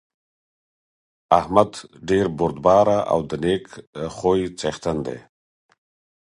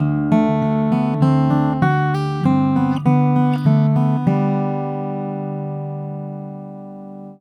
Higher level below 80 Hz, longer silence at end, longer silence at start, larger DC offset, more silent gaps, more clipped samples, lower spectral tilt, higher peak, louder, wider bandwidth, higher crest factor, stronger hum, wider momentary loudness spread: about the same, -48 dBFS vs -50 dBFS; first, 1 s vs 0.05 s; first, 1.3 s vs 0 s; neither; first, 3.87-3.93 s vs none; neither; second, -6 dB/octave vs -9.5 dB/octave; about the same, 0 dBFS vs -2 dBFS; second, -21 LUFS vs -18 LUFS; first, 11.5 kHz vs 5.8 kHz; first, 22 dB vs 16 dB; second, none vs 50 Hz at -45 dBFS; about the same, 15 LU vs 15 LU